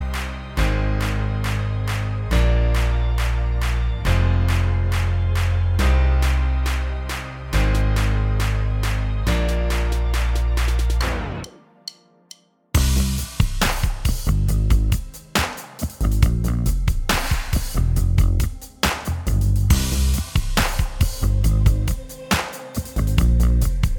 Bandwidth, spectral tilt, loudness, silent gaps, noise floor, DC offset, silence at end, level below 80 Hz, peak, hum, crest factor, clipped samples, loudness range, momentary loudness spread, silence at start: 19 kHz; -5 dB/octave; -22 LUFS; none; -48 dBFS; under 0.1%; 0 s; -22 dBFS; -2 dBFS; none; 18 dB; under 0.1%; 3 LU; 8 LU; 0 s